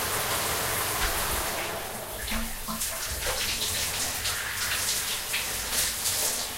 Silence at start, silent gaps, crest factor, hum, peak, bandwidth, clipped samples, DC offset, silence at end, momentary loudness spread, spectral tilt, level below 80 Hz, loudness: 0 s; none; 18 dB; none; -12 dBFS; 16 kHz; under 0.1%; under 0.1%; 0 s; 6 LU; -1 dB/octave; -42 dBFS; -27 LUFS